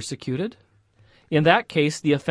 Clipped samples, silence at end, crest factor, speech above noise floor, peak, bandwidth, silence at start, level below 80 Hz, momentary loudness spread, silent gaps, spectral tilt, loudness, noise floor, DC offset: under 0.1%; 0 s; 20 dB; 36 dB; -4 dBFS; 11 kHz; 0 s; -62 dBFS; 11 LU; none; -5.5 dB/octave; -22 LUFS; -58 dBFS; under 0.1%